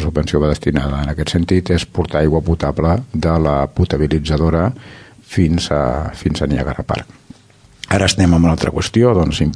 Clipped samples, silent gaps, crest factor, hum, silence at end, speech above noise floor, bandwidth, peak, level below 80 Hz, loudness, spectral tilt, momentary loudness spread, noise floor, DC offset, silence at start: under 0.1%; none; 16 dB; none; 0 s; 32 dB; 11 kHz; 0 dBFS; -26 dBFS; -16 LUFS; -6.5 dB/octave; 8 LU; -47 dBFS; under 0.1%; 0 s